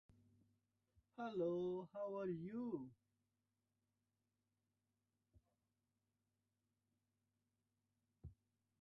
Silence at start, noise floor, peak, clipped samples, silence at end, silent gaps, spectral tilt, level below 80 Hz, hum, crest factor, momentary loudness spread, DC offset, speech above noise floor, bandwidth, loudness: 1.2 s; under -90 dBFS; -32 dBFS; under 0.1%; 0.5 s; none; -8 dB/octave; -80 dBFS; 50 Hz at -85 dBFS; 20 dB; 21 LU; under 0.1%; over 44 dB; 6.2 kHz; -47 LUFS